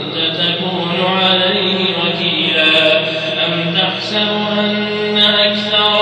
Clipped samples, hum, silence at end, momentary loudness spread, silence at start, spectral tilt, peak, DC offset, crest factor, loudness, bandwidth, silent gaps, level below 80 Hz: under 0.1%; none; 0 s; 6 LU; 0 s; -5 dB/octave; 0 dBFS; under 0.1%; 14 dB; -13 LUFS; 11 kHz; none; -58 dBFS